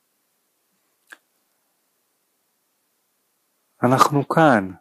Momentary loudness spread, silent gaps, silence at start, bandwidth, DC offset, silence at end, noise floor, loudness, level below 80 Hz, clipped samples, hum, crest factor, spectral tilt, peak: 5 LU; none; 3.8 s; 15.5 kHz; under 0.1%; 0.05 s; -70 dBFS; -17 LUFS; -72 dBFS; under 0.1%; none; 22 dB; -6 dB/octave; -2 dBFS